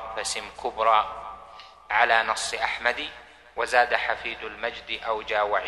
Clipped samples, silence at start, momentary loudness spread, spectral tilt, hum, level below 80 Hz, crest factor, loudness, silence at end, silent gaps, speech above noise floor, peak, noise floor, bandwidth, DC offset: under 0.1%; 0 s; 15 LU; -0.5 dB/octave; none; -56 dBFS; 22 dB; -25 LUFS; 0 s; none; 21 dB; -4 dBFS; -47 dBFS; 12.5 kHz; under 0.1%